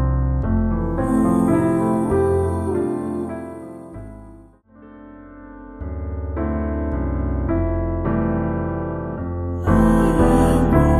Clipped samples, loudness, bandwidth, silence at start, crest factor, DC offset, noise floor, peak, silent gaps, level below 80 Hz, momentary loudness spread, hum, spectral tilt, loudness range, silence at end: under 0.1%; -20 LUFS; 13 kHz; 0 s; 18 dB; under 0.1%; -46 dBFS; -2 dBFS; none; -28 dBFS; 20 LU; none; -8.5 dB/octave; 11 LU; 0 s